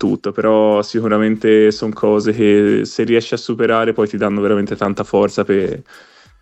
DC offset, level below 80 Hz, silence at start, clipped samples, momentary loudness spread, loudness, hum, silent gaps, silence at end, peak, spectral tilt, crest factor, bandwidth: under 0.1%; -52 dBFS; 0 s; under 0.1%; 6 LU; -15 LUFS; none; none; 0.6 s; -2 dBFS; -6.5 dB/octave; 14 dB; 8.4 kHz